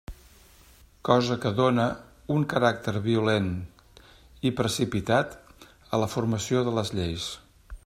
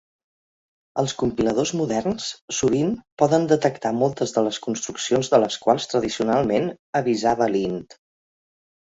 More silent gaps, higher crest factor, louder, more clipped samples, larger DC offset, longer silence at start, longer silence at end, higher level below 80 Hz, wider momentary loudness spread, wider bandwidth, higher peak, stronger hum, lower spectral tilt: second, none vs 2.42-2.48 s, 3.12-3.17 s, 6.79-6.93 s; about the same, 22 dB vs 20 dB; second, -26 LUFS vs -22 LUFS; neither; neither; second, 0.1 s vs 0.95 s; second, 0.1 s vs 0.9 s; about the same, -52 dBFS vs -54 dBFS; first, 12 LU vs 8 LU; first, 15.5 kHz vs 8 kHz; second, -6 dBFS vs -2 dBFS; neither; about the same, -5.5 dB/octave vs -5 dB/octave